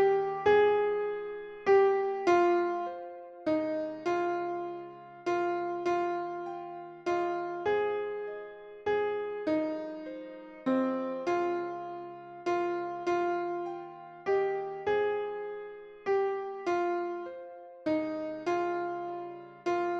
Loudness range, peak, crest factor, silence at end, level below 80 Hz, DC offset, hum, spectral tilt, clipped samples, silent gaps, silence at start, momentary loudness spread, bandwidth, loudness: 5 LU; -14 dBFS; 18 dB; 0 s; -70 dBFS; under 0.1%; none; -6 dB/octave; under 0.1%; none; 0 s; 16 LU; 7.2 kHz; -31 LUFS